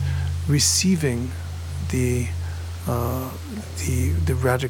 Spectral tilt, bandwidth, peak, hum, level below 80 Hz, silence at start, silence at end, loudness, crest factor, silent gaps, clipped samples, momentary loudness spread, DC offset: -4.5 dB/octave; 17.5 kHz; -6 dBFS; none; -34 dBFS; 0 s; 0 s; -23 LUFS; 16 dB; none; under 0.1%; 14 LU; under 0.1%